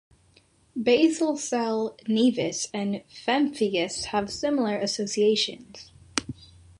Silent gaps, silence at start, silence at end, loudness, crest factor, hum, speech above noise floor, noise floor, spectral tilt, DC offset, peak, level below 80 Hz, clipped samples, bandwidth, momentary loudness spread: none; 0.75 s; 0.45 s; -26 LUFS; 22 dB; none; 36 dB; -61 dBFS; -3.5 dB/octave; under 0.1%; -6 dBFS; -60 dBFS; under 0.1%; 11.5 kHz; 10 LU